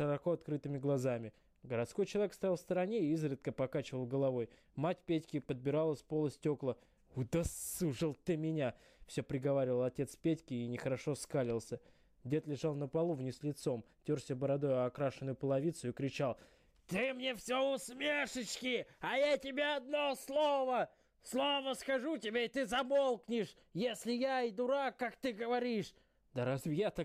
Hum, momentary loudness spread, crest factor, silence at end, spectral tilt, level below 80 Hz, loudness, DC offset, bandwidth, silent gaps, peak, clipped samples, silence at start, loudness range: none; 7 LU; 12 dB; 0 s; -5.5 dB/octave; -66 dBFS; -38 LUFS; under 0.1%; 15.5 kHz; none; -26 dBFS; under 0.1%; 0 s; 3 LU